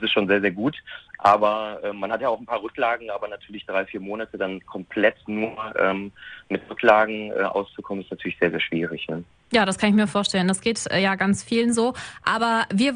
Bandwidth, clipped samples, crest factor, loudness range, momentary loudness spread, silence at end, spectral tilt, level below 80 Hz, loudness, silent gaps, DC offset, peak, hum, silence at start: 10.5 kHz; under 0.1%; 20 dB; 5 LU; 13 LU; 0 s; -4.5 dB/octave; -58 dBFS; -23 LUFS; none; under 0.1%; -2 dBFS; none; 0 s